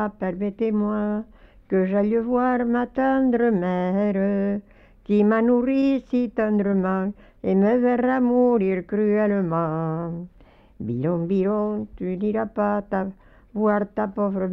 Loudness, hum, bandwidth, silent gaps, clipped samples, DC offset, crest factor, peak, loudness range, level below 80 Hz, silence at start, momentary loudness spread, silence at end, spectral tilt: -23 LUFS; none; 5.8 kHz; none; under 0.1%; under 0.1%; 14 dB; -10 dBFS; 4 LU; -52 dBFS; 0 s; 9 LU; 0 s; -10.5 dB/octave